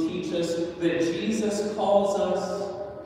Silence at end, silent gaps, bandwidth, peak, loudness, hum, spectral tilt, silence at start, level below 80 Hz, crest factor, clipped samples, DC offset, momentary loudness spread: 0 s; none; 15.5 kHz; -8 dBFS; -26 LUFS; none; -5.5 dB/octave; 0 s; -58 dBFS; 18 dB; under 0.1%; under 0.1%; 7 LU